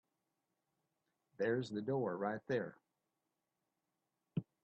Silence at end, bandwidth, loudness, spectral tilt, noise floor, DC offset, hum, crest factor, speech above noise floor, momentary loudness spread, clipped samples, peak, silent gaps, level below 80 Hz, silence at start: 0.2 s; 6.8 kHz; -41 LUFS; -6 dB/octave; -89 dBFS; under 0.1%; none; 20 dB; 50 dB; 8 LU; under 0.1%; -24 dBFS; none; -82 dBFS; 1.4 s